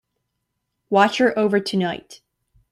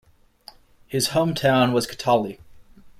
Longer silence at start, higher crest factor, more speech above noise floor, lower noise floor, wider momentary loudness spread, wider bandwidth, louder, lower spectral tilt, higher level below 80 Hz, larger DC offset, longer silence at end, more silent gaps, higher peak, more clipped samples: about the same, 0.9 s vs 0.9 s; about the same, 20 dB vs 16 dB; first, 58 dB vs 29 dB; first, -77 dBFS vs -50 dBFS; about the same, 9 LU vs 8 LU; second, 14.5 kHz vs 16 kHz; first, -19 LUFS vs -22 LUFS; about the same, -5.5 dB/octave vs -4.5 dB/octave; second, -64 dBFS vs -54 dBFS; neither; first, 0.55 s vs 0.1 s; neither; first, -2 dBFS vs -8 dBFS; neither